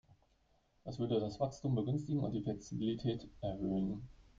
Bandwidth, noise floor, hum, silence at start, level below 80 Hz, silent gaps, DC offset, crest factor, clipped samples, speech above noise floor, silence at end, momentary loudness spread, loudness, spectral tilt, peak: 7.6 kHz; -74 dBFS; none; 0.85 s; -60 dBFS; none; under 0.1%; 18 dB; under 0.1%; 36 dB; 0.15 s; 7 LU; -39 LUFS; -8 dB/octave; -22 dBFS